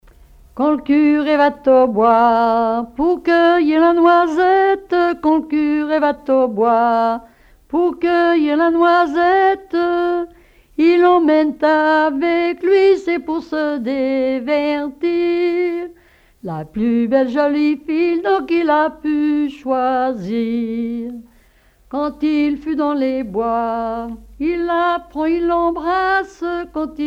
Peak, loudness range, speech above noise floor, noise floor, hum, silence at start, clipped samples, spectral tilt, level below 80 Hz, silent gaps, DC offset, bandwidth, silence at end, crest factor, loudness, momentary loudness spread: -2 dBFS; 7 LU; 36 dB; -52 dBFS; none; 0.55 s; under 0.1%; -6.5 dB/octave; -48 dBFS; none; under 0.1%; 7.2 kHz; 0 s; 14 dB; -16 LUFS; 10 LU